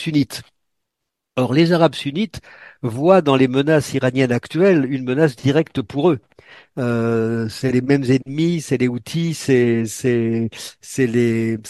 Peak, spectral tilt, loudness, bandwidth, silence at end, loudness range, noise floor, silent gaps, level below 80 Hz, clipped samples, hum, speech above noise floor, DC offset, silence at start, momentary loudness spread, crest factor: 0 dBFS; -6.5 dB/octave; -18 LUFS; 12.5 kHz; 0 s; 3 LU; -80 dBFS; none; -54 dBFS; under 0.1%; none; 62 dB; under 0.1%; 0 s; 10 LU; 18 dB